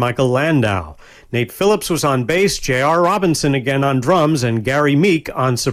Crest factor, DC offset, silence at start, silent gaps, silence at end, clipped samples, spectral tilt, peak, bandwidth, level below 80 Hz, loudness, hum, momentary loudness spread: 12 dB; under 0.1%; 0 s; none; 0 s; under 0.1%; -5.5 dB/octave; -4 dBFS; 16 kHz; -42 dBFS; -16 LUFS; none; 5 LU